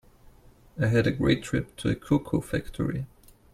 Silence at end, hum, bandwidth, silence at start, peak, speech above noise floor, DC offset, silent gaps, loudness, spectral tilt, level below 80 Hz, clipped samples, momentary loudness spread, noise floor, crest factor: 0.45 s; none; 15 kHz; 0.75 s; -8 dBFS; 28 dB; under 0.1%; none; -27 LUFS; -7 dB/octave; -46 dBFS; under 0.1%; 10 LU; -54 dBFS; 20 dB